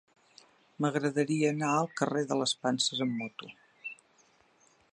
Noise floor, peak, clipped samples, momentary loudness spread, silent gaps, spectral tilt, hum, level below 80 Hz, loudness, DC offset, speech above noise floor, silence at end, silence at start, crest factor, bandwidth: -66 dBFS; -12 dBFS; under 0.1%; 15 LU; none; -4.5 dB/octave; none; -80 dBFS; -30 LUFS; under 0.1%; 36 dB; 1 s; 0.8 s; 20 dB; 10.5 kHz